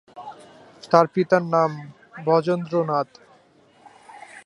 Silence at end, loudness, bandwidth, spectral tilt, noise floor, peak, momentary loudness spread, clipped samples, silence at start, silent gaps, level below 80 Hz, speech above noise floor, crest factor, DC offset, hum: 0.05 s; -21 LUFS; 11 kHz; -7 dB/octave; -56 dBFS; -2 dBFS; 22 LU; under 0.1%; 0.15 s; none; -72 dBFS; 35 dB; 22 dB; under 0.1%; none